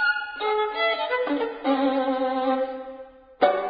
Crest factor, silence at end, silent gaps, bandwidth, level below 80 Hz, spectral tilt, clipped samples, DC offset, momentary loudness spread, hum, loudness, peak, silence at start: 20 dB; 0 s; none; 5.2 kHz; -64 dBFS; -7.5 dB/octave; under 0.1%; under 0.1%; 8 LU; none; -25 LUFS; -6 dBFS; 0 s